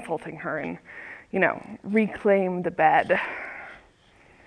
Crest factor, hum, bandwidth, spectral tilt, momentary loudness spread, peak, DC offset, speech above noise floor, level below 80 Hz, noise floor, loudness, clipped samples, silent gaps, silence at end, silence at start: 20 dB; none; 11 kHz; -7.5 dB/octave; 19 LU; -6 dBFS; under 0.1%; 32 dB; -62 dBFS; -56 dBFS; -25 LUFS; under 0.1%; none; 0.7 s; 0 s